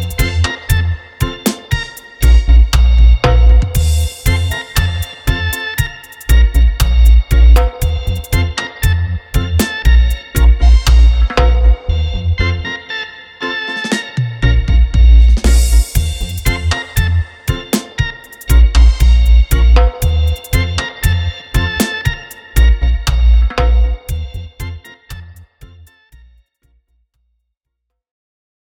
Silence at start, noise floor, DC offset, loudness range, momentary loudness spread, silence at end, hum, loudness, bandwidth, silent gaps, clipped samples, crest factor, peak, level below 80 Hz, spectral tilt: 0 s; -74 dBFS; under 0.1%; 4 LU; 11 LU; 3.3 s; none; -14 LUFS; 17 kHz; none; under 0.1%; 12 dB; 0 dBFS; -12 dBFS; -5 dB/octave